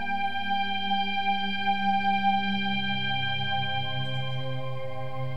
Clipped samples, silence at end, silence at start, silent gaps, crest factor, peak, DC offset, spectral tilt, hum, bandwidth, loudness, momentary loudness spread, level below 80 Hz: under 0.1%; 0 s; 0 s; none; 14 dB; -14 dBFS; 3%; -6 dB/octave; 50 Hz at -50 dBFS; 9 kHz; -28 LUFS; 9 LU; -62 dBFS